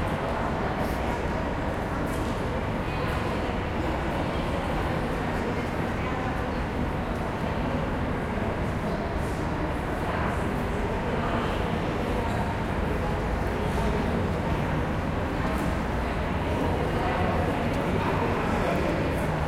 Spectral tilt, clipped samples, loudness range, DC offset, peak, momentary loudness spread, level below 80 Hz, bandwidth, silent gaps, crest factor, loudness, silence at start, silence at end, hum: -7 dB/octave; under 0.1%; 2 LU; under 0.1%; -14 dBFS; 3 LU; -36 dBFS; 16 kHz; none; 14 dB; -28 LUFS; 0 s; 0 s; none